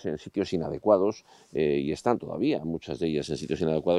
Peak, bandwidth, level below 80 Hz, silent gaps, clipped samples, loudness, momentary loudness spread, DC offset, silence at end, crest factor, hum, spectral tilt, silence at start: -8 dBFS; 11.5 kHz; -58 dBFS; none; under 0.1%; -28 LUFS; 8 LU; under 0.1%; 0 s; 20 dB; none; -6.5 dB/octave; 0 s